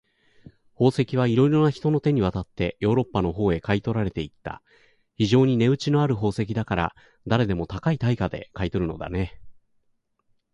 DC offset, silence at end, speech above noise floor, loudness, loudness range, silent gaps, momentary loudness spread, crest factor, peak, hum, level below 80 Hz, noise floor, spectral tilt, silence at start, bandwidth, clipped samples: under 0.1%; 1 s; 47 dB; -24 LUFS; 4 LU; none; 11 LU; 18 dB; -6 dBFS; none; -44 dBFS; -69 dBFS; -7.5 dB/octave; 0.8 s; 11 kHz; under 0.1%